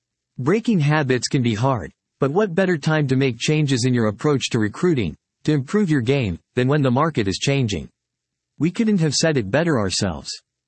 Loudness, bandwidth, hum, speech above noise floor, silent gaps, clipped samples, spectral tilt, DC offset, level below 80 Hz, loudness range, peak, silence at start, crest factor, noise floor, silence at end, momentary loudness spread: -20 LUFS; 8.8 kHz; none; 61 dB; none; under 0.1%; -5.5 dB/octave; under 0.1%; -52 dBFS; 1 LU; -4 dBFS; 0.4 s; 16 dB; -81 dBFS; 0.3 s; 7 LU